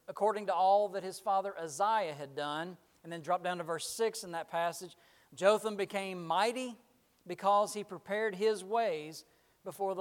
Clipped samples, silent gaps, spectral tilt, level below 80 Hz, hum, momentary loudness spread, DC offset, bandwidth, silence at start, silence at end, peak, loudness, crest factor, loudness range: under 0.1%; none; -3.5 dB/octave; -84 dBFS; none; 17 LU; under 0.1%; 17 kHz; 0.1 s; 0 s; -14 dBFS; -34 LUFS; 22 dB; 3 LU